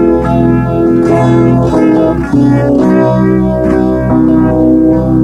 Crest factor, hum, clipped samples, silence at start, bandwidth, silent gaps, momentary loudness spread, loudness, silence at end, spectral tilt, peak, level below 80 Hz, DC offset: 8 dB; none; under 0.1%; 0 s; 8.4 kHz; none; 2 LU; -9 LUFS; 0 s; -9.5 dB/octave; 0 dBFS; -24 dBFS; under 0.1%